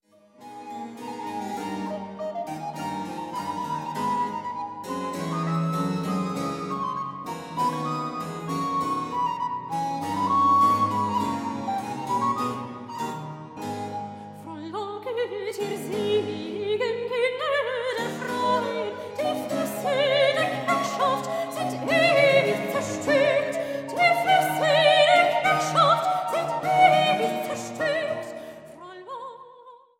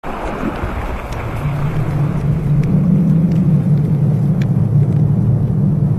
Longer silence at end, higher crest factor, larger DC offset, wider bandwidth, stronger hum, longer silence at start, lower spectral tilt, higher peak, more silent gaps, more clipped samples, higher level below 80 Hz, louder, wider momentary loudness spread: first, 0.2 s vs 0 s; first, 20 dB vs 10 dB; neither; first, 16.5 kHz vs 6.2 kHz; neither; first, 0.4 s vs 0.05 s; second, -4.5 dB/octave vs -9.5 dB/octave; about the same, -6 dBFS vs -4 dBFS; neither; neither; second, -68 dBFS vs -28 dBFS; second, -25 LUFS vs -16 LUFS; first, 16 LU vs 9 LU